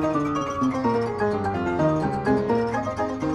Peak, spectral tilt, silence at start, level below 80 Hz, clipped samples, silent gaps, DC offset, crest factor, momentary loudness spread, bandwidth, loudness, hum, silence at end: -8 dBFS; -7.5 dB/octave; 0 s; -48 dBFS; under 0.1%; none; under 0.1%; 14 dB; 4 LU; 10.5 kHz; -24 LUFS; none; 0 s